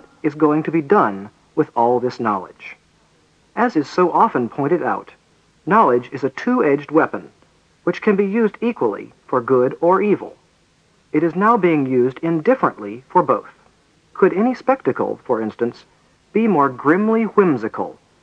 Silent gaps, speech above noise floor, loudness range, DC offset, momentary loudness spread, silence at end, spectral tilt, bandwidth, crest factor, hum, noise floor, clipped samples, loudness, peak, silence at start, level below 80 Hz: none; 40 dB; 2 LU; under 0.1%; 10 LU; 0.3 s; -8.5 dB/octave; 8 kHz; 18 dB; none; -58 dBFS; under 0.1%; -18 LUFS; 0 dBFS; 0.25 s; -66 dBFS